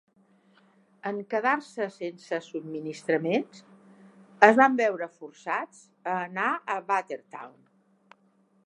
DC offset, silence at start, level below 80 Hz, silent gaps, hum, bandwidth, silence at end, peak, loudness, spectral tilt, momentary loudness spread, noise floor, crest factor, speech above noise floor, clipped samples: under 0.1%; 1.05 s; -82 dBFS; none; none; 11 kHz; 1.15 s; 0 dBFS; -27 LUFS; -5.5 dB/octave; 19 LU; -66 dBFS; 28 dB; 39 dB; under 0.1%